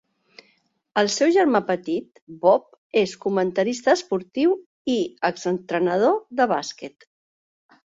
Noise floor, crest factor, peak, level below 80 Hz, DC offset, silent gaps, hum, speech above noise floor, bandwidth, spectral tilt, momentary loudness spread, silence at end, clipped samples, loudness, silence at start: -65 dBFS; 18 dB; -4 dBFS; -68 dBFS; under 0.1%; 2.22-2.27 s, 2.78-2.90 s, 4.66-4.85 s; none; 44 dB; 8 kHz; -4.5 dB/octave; 9 LU; 1.05 s; under 0.1%; -22 LUFS; 0.95 s